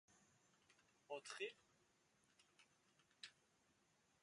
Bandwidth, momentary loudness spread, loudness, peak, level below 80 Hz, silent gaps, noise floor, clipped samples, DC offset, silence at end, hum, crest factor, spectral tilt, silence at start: 11 kHz; 11 LU; -55 LUFS; -36 dBFS; under -90 dBFS; none; -81 dBFS; under 0.1%; under 0.1%; 0.9 s; none; 24 dB; -1.5 dB/octave; 0.1 s